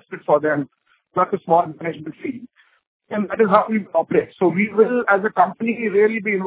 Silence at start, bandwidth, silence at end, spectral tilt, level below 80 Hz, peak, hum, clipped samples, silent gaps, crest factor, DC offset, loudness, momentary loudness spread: 0.1 s; 4 kHz; 0 s; -10.5 dB/octave; -64 dBFS; 0 dBFS; none; under 0.1%; 2.87-3.00 s; 20 dB; under 0.1%; -19 LUFS; 13 LU